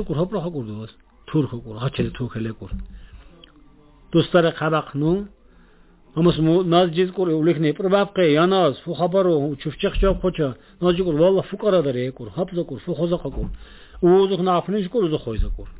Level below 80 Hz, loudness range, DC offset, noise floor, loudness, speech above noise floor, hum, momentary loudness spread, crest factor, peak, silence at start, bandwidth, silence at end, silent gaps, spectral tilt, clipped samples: -36 dBFS; 8 LU; under 0.1%; -51 dBFS; -21 LUFS; 31 dB; none; 13 LU; 18 dB; -4 dBFS; 0 s; 4 kHz; 0 s; none; -11.5 dB/octave; under 0.1%